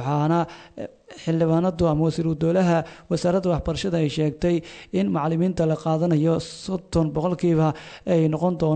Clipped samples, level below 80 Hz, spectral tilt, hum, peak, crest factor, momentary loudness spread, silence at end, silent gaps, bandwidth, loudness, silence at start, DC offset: under 0.1%; -44 dBFS; -7.5 dB/octave; none; -8 dBFS; 14 dB; 9 LU; 0 s; none; 9 kHz; -23 LUFS; 0 s; under 0.1%